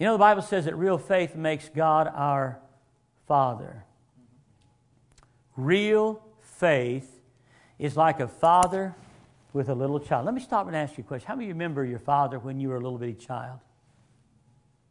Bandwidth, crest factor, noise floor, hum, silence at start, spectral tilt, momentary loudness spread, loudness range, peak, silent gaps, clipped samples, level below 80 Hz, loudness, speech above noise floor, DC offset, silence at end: 11 kHz; 22 dB; -65 dBFS; none; 0 s; -6 dB/octave; 15 LU; 6 LU; -6 dBFS; none; under 0.1%; -64 dBFS; -26 LUFS; 40 dB; under 0.1%; 1.3 s